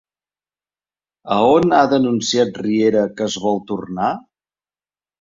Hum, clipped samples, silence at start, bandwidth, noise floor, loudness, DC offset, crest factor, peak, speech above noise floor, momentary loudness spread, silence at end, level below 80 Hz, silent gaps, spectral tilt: 50 Hz at -45 dBFS; under 0.1%; 1.25 s; 7.8 kHz; under -90 dBFS; -17 LUFS; under 0.1%; 18 dB; -2 dBFS; over 74 dB; 9 LU; 1 s; -56 dBFS; none; -5 dB/octave